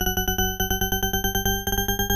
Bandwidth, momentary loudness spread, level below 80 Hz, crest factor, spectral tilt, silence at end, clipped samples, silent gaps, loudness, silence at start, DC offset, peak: 14 kHz; 1 LU; -32 dBFS; 14 dB; -2.5 dB/octave; 0 s; under 0.1%; none; -23 LUFS; 0 s; under 0.1%; -10 dBFS